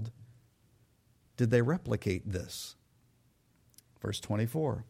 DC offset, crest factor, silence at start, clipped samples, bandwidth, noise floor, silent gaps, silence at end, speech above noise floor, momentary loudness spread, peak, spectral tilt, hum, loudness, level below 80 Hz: under 0.1%; 20 dB; 0 s; under 0.1%; 16 kHz; -69 dBFS; none; 0.05 s; 37 dB; 15 LU; -14 dBFS; -6.5 dB/octave; none; -33 LUFS; -60 dBFS